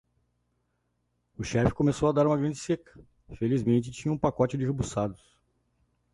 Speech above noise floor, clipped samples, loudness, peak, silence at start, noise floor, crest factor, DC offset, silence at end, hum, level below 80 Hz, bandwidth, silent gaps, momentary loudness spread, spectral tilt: 49 dB; under 0.1%; -28 LUFS; -8 dBFS; 1.4 s; -76 dBFS; 20 dB; under 0.1%; 1 s; 60 Hz at -45 dBFS; -50 dBFS; 11.5 kHz; none; 8 LU; -7 dB/octave